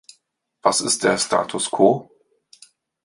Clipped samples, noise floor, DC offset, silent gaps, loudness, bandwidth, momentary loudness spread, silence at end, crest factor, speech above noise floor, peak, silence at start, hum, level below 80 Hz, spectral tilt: under 0.1%; -67 dBFS; under 0.1%; none; -19 LUFS; 11.5 kHz; 6 LU; 1 s; 20 dB; 48 dB; -2 dBFS; 0.65 s; none; -64 dBFS; -3 dB/octave